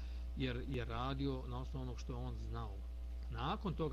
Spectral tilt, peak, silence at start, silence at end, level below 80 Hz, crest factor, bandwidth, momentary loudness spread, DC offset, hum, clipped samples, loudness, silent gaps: -7 dB/octave; -26 dBFS; 0 s; 0 s; -46 dBFS; 16 dB; 7.4 kHz; 7 LU; under 0.1%; none; under 0.1%; -43 LUFS; none